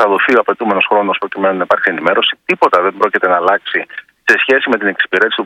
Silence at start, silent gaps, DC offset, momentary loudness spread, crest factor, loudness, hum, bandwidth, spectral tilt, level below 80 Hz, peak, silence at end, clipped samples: 0 s; none; under 0.1%; 5 LU; 14 dB; -13 LUFS; none; 13.5 kHz; -4.5 dB/octave; -62 dBFS; 0 dBFS; 0 s; 0.3%